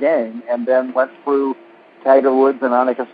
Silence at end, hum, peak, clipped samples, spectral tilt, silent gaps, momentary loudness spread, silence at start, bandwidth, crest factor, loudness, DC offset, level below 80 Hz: 0.1 s; none; 0 dBFS; under 0.1%; -9 dB/octave; none; 10 LU; 0 s; 4.9 kHz; 16 dB; -17 LUFS; under 0.1%; -78 dBFS